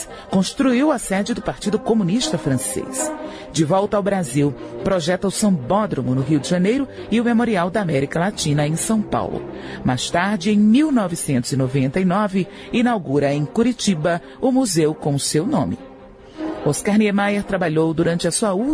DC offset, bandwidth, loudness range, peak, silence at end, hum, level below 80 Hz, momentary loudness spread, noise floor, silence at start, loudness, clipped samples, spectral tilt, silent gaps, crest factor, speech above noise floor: under 0.1%; 11 kHz; 2 LU; -6 dBFS; 0 s; none; -48 dBFS; 6 LU; -41 dBFS; 0 s; -19 LUFS; under 0.1%; -5.5 dB/octave; none; 14 dB; 22 dB